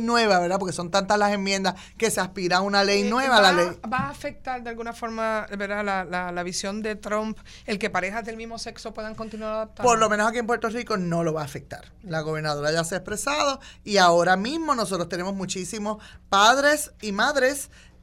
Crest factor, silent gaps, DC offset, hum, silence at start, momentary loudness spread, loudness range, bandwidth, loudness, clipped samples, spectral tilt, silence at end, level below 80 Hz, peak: 20 dB; none; under 0.1%; none; 0 s; 15 LU; 7 LU; 16 kHz; -24 LUFS; under 0.1%; -3.5 dB/octave; 0.25 s; -50 dBFS; -4 dBFS